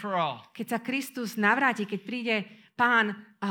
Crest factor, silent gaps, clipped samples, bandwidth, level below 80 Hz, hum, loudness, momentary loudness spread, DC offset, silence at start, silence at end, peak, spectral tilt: 20 dB; none; under 0.1%; 19 kHz; -82 dBFS; none; -27 LUFS; 11 LU; under 0.1%; 0 s; 0 s; -8 dBFS; -4.5 dB/octave